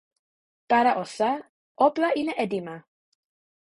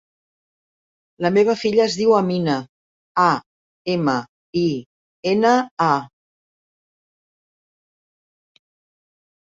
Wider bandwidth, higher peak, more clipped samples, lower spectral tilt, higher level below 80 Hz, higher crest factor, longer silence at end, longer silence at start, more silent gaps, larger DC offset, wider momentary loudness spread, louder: first, 11.5 kHz vs 7.8 kHz; second, -6 dBFS vs -2 dBFS; neither; about the same, -5 dB/octave vs -6 dB/octave; second, -72 dBFS vs -64 dBFS; about the same, 20 dB vs 20 dB; second, 0.9 s vs 3.5 s; second, 0.7 s vs 1.2 s; second, 1.49-1.75 s vs 2.69-3.15 s, 3.46-3.85 s, 4.29-4.53 s, 4.86-5.23 s, 5.71-5.77 s; neither; about the same, 12 LU vs 10 LU; second, -25 LUFS vs -19 LUFS